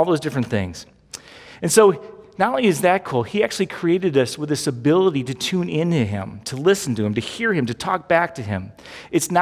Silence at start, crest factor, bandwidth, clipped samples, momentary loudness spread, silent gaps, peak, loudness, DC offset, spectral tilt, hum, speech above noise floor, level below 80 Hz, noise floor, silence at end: 0 s; 18 dB; 16 kHz; under 0.1%; 14 LU; none; -2 dBFS; -20 LUFS; under 0.1%; -5 dB/octave; none; 21 dB; -50 dBFS; -41 dBFS; 0 s